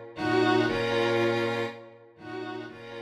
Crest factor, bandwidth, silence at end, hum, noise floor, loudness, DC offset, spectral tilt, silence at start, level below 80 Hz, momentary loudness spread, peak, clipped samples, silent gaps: 16 dB; 12 kHz; 0 s; none; -48 dBFS; -27 LUFS; under 0.1%; -6 dB/octave; 0 s; -60 dBFS; 17 LU; -12 dBFS; under 0.1%; none